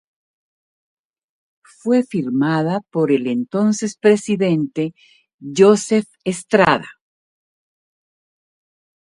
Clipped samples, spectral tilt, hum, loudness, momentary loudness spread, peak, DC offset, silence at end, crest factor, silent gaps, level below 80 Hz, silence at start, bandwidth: under 0.1%; -5.5 dB/octave; none; -18 LUFS; 12 LU; 0 dBFS; under 0.1%; 2.25 s; 20 dB; 5.34-5.38 s; -60 dBFS; 1.85 s; 11.5 kHz